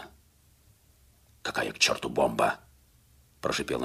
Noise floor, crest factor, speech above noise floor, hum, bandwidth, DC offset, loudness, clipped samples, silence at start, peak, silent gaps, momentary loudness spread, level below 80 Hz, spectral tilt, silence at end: -62 dBFS; 22 dB; 34 dB; none; 15.5 kHz; under 0.1%; -28 LUFS; under 0.1%; 0 s; -10 dBFS; none; 14 LU; -58 dBFS; -2.5 dB/octave; 0 s